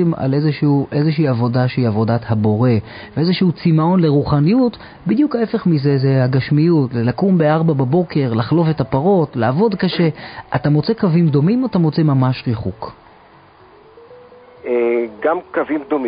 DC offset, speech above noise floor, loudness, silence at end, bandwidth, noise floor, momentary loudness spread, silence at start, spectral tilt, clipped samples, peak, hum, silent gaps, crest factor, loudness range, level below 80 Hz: under 0.1%; 30 dB; -16 LUFS; 0 s; 5.2 kHz; -45 dBFS; 6 LU; 0 s; -13 dB/octave; under 0.1%; -2 dBFS; none; none; 14 dB; 6 LU; -46 dBFS